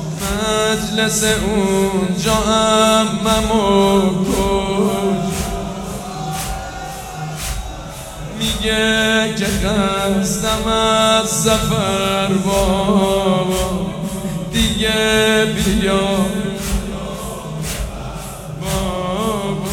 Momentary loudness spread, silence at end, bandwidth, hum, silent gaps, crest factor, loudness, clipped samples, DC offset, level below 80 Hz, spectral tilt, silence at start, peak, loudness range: 13 LU; 0 s; 18 kHz; none; none; 16 dB; -17 LUFS; under 0.1%; under 0.1%; -30 dBFS; -4 dB/octave; 0 s; -2 dBFS; 8 LU